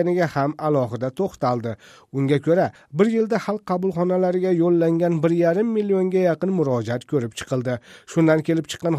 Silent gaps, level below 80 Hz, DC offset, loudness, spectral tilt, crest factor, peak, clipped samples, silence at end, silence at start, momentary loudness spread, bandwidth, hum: none; -60 dBFS; under 0.1%; -21 LUFS; -7.5 dB/octave; 16 dB; -4 dBFS; under 0.1%; 0 s; 0 s; 7 LU; 14 kHz; none